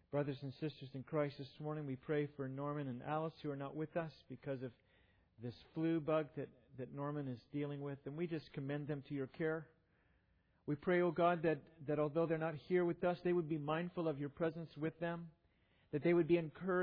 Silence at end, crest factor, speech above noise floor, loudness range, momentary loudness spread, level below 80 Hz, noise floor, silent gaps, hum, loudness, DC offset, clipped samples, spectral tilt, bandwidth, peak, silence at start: 0 s; 18 dB; 36 dB; 7 LU; 13 LU; -76 dBFS; -76 dBFS; none; none; -41 LUFS; under 0.1%; under 0.1%; -6.5 dB/octave; 5.2 kHz; -22 dBFS; 0.1 s